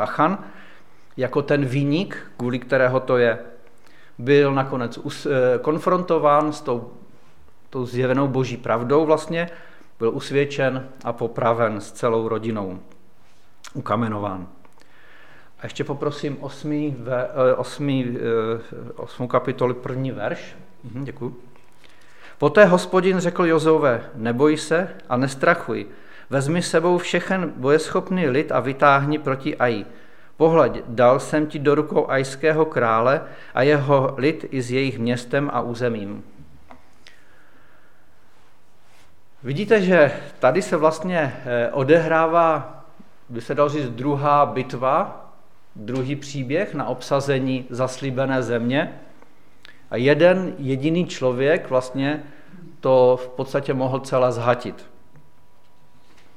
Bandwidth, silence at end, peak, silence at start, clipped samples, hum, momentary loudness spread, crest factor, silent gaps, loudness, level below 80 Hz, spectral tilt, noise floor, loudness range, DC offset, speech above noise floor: 13 kHz; 1.55 s; 0 dBFS; 0 s; under 0.1%; none; 14 LU; 20 dB; none; -21 LUFS; -60 dBFS; -6.5 dB/octave; -58 dBFS; 8 LU; 1%; 37 dB